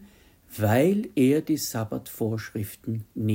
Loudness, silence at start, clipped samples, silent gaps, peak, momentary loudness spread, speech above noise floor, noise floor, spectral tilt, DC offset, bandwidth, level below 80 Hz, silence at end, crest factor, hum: -26 LUFS; 0 s; under 0.1%; none; -10 dBFS; 12 LU; 28 dB; -53 dBFS; -6 dB/octave; under 0.1%; 16.5 kHz; -62 dBFS; 0 s; 16 dB; none